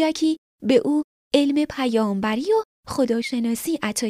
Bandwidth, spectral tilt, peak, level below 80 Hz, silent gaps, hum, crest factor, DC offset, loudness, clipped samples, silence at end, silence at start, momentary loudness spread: 15.5 kHz; -4.5 dB/octave; -4 dBFS; -56 dBFS; 0.38-0.59 s, 1.04-1.31 s, 2.65-2.83 s; none; 18 dB; under 0.1%; -22 LUFS; under 0.1%; 0 s; 0 s; 5 LU